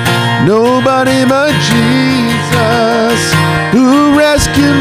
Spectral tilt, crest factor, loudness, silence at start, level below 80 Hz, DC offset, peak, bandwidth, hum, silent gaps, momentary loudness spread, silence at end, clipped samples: -5 dB/octave; 8 dB; -9 LUFS; 0 s; -32 dBFS; under 0.1%; 0 dBFS; 16 kHz; none; none; 3 LU; 0 s; under 0.1%